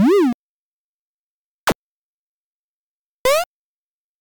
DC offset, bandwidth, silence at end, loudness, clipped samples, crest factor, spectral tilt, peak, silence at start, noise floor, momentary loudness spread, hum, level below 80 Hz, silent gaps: under 0.1%; 19.5 kHz; 0.75 s; -20 LUFS; under 0.1%; 14 dB; -4.5 dB/octave; -8 dBFS; 0 s; under -90 dBFS; 14 LU; none; -54 dBFS; 0.34-1.67 s, 1.75-3.25 s